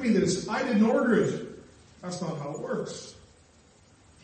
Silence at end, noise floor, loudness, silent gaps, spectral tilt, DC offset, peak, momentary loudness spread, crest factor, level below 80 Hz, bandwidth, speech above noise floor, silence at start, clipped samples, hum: 1.1 s; -58 dBFS; -27 LUFS; none; -5.5 dB/octave; under 0.1%; -12 dBFS; 20 LU; 16 dB; -62 dBFS; 8.8 kHz; 32 dB; 0 s; under 0.1%; none